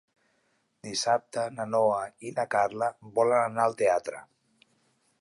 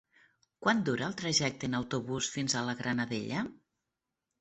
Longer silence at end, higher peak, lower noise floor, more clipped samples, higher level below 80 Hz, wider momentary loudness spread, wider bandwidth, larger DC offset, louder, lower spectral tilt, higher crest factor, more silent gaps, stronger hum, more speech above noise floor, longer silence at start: first, 1 s vs 0.85 s; about the same, -10 dBFS vs -12 dBFS; second, -72 dBFS vs -88 dBFS; neither; second, -74 dBFS vs -66 dBFS; first, 10 LU vs 6 LU; first, 11.5 kHz vs 8.2 kHz; neither; first, -28 LUFS vs -32 LUFS; about the same, -3.5 dB/octave vs -3.5 dB/octave; about the same, 18 dB vs 22 dB; neither; neither; second, 45 dB vs 55 dB; first, 0.85 s vs 0.6 s